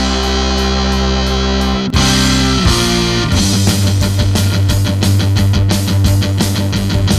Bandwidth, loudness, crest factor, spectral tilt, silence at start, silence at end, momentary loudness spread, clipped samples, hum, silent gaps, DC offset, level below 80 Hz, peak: 14.5 kHz; -13 LUFS; 12 dB; -4.5 dB/octave; 0 s; 0 s; 3 LU; under 0.1%; none; none; under 0.1%; -20 dBFS; 0 dBFS